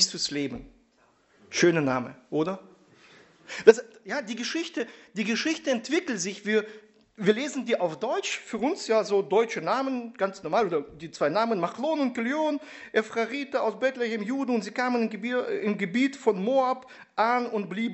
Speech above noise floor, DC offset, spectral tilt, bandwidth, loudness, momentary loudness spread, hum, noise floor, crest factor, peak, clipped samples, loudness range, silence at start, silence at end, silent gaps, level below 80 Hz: 38 dB; under 0.1%; -4 dB/octave; 8.2 kHz; -27 LUFS; 8 LU; none; -64 dBFS; 26 dB; -2 dBFS; under 0.1%; 2 LU; 0 s; 0 s; none; -66 dBFS